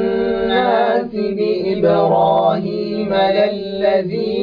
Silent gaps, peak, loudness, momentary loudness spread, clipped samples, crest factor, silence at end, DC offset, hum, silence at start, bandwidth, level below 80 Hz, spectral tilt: none; -4 dBFS; -16 LUFS; 7 LU; under 0.1%; 12 dB; 0 s; under 0.1%; none; 0 s; 5.2 kHz; -48 dBFS; -8.5 dB/octave